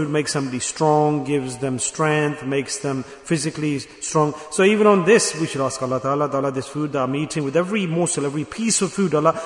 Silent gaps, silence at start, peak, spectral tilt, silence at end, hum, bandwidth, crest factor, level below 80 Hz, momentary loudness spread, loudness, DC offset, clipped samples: none; 0 s; -2 dBFS; -4.5 dB/octave; 0 s; none; 11 kHz; 18 dB; -58 dBFS; 9 LU; -21 LUFS; under 0.1%; under 0.1%